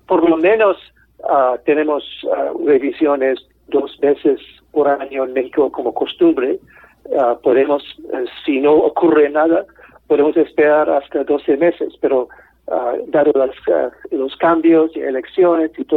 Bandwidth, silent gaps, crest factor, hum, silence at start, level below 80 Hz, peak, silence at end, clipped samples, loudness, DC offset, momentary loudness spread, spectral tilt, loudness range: 4.2 kHz; none; 12 dB; none; 0.1 s; -56 dBFS; -4 dBFS; 0 s; under 0.1%; -16 LUFS; under 0.1%; 9 LU; -8.5 dB/octave; 3 LU